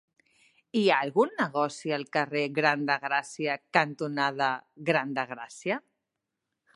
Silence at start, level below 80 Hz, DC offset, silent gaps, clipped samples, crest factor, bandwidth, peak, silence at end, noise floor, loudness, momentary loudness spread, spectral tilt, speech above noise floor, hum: 0.75 s; -82 dBFS; under 0.1%; none; under 0.1%; 24 dB; 11.5 kHz; -6 dBFS; 0.95 s; -85 dBFS; -28 LUFS; 8 LU; -5 dB/octave; 57 dB; none